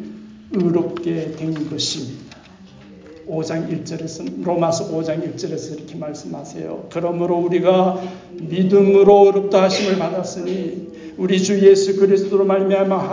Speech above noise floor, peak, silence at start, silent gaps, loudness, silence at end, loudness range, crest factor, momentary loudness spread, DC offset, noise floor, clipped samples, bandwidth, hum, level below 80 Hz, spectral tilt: 25 dB; -2 dBFS; 0 s; none; -17 LUFS; 0 s; 10 LU; 16 dB; 18 LU; under 0.1%; -43 dBFS; under 0.1%; 7.6 kHz; none; -56 dBFS; -6 dB/octave